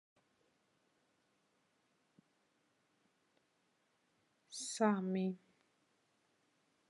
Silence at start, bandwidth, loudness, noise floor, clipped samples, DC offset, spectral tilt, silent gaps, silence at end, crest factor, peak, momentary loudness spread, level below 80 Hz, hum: 4.5 s; 11 kHz; -38 LUFS; -80 dBFS; under 0.1%; under 0.1%; -5 dB/octave; none; 1.5 s; 26 dB; -20 dBFS; 16 LU; under -90 dBFS; none